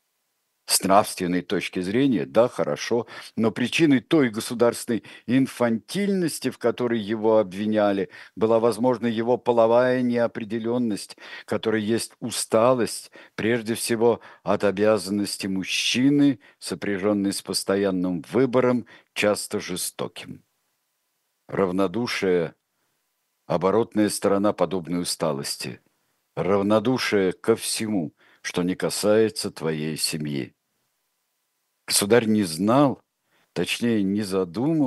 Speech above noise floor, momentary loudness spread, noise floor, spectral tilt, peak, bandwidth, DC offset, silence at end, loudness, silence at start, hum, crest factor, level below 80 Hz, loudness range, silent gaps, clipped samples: 52 dB; 10 LU; -75 dBFS; -4.5 dB/octave; -2 dBFS; 13 kHz; under 0.1%; 0 s; -23 LUFS; 0.7 s; none; 22 dB; -68 dBFS; 4 LU; none; under 0.1%